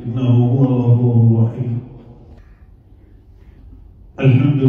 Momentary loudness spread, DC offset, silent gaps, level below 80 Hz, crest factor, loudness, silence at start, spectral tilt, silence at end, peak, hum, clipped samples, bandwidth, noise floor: 10 LU; under 0.1%; none; -44 dBFS; 14 dB; -15 LUFS; 0 s; -11 dB/octave; 0 s; -2 dBFS; none; under 0.1%; 3.5 kHz; -45 dBFS